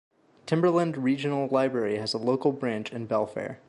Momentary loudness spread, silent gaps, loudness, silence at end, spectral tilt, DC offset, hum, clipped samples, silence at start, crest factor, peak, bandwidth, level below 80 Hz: 7 LU; none; -27 LUFS; 0.15 s; -6.5 dB/octave; under 0.1%; none; under 0.1%; 0.45 s; 16 dB; -10 dBFS; 11.5 kHz; -70 dBFS